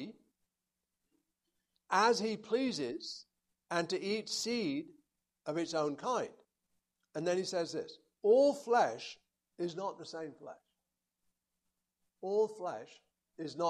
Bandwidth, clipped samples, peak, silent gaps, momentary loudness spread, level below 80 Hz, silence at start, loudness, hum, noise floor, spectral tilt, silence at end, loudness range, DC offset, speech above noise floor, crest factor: 13 kHz; under 0.1%; -16 dBFS; none; 18 LU; -84 dBFS; 0 s; -35 LUFS; none; -89 dBFS; -4 dB/octave; 0 s; 8 LU; under 0.1%; 55 dB; 22 dB